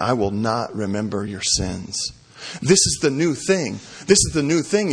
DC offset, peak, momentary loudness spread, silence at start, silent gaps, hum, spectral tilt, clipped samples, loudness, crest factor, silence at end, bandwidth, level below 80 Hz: under 0.1%; 0 dBFS; 12 LU; 0 s; none; none; -3.5 dB/octave; under 0.1%; -20 LUFS; 20 dB; 0 s; 10.5 kHz; -42 dBFS